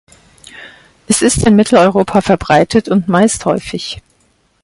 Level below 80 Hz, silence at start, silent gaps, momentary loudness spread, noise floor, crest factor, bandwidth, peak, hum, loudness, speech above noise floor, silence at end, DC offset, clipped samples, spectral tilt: -36 dBFS; 0.55 s; none; 13 LU; -56 dBFS; 14 dB; 11.5 kHz; 0 dBFS; none; -12 LUFS; 45 dB; 0.65 s; under 0.1%; under 0.1%; -5 dB/octave